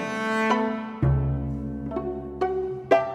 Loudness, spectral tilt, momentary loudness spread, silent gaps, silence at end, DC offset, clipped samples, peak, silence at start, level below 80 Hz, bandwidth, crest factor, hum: -26 LUFS; -7.5 dB/octave; 8 LU; none; 0 s; under 0.1%; under 0.1%; -6 dBFS; 0 s; -38 dBFS; 10.5 kHz; 20 dB; none